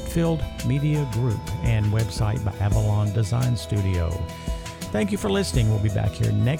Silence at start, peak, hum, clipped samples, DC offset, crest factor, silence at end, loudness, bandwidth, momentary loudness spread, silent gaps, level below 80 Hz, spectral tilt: 0 s; -8 dBFS; none; under 0.1%; under 0.1%; 14 dB; 0 s; -24 LUFS; 16 kHz; 6 LU; none; -34 dBFS; -6.5 dB/octave